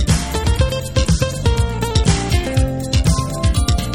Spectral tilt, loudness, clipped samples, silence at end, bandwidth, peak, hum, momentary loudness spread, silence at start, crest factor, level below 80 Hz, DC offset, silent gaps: -5 dB/octave; -18 LUFS; under 0.1%; 0 s; 17.5 kHz; -2 dBFS; none; 3 LU; 0 s; 14 dB; -20 dBFS; under 0.1%; none